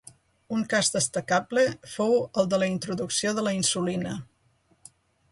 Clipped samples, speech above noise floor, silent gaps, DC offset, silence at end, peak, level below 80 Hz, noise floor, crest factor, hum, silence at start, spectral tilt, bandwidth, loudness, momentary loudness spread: under 0.1%; 40 dB; none; under 0.1%; 1.05 s; -10 dBFS; -64 dBFS; -66 dBFS; 16 dB; none; 0.5 s; -3.5 dB/octave; 11.5 kHz; -26 LUFS; 7 LU